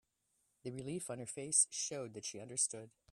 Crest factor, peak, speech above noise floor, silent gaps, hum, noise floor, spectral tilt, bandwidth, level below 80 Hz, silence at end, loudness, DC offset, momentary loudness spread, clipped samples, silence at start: 24 dB; -18 dBFS; 41 dB; none; none; -81 dBFS; -2.5 dB/octave; 15 kHz; -80 dBFS; 0.25 s; -37 LUFS; under 0.1%; 16 LU; under 0.1%; 0.65 s